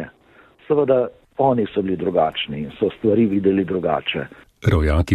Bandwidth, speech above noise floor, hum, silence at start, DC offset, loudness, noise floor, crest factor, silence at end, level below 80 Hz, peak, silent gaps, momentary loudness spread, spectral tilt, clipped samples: 11.5 kHz; 33 dB; none; 0 s; under 0.1%; -20 LUFS; -52 dBFS; 16 dB; 0 s; -32 dBFS; -4 dBFS; none; 9 LU; -8 dB/octave; under 0.1%